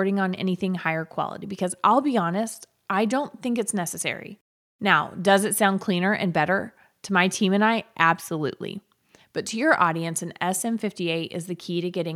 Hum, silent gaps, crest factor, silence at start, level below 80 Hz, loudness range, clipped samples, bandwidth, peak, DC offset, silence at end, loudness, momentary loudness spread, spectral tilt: none; 4.41-4.79 s; 22 dB; 0 s; -72 dBFS; 4 LU; under 0.1%; 16 kHz; -2 dBFS; under 0.1%; 0 s; -24 LUFS; 12 LU; -4.5 dB/octave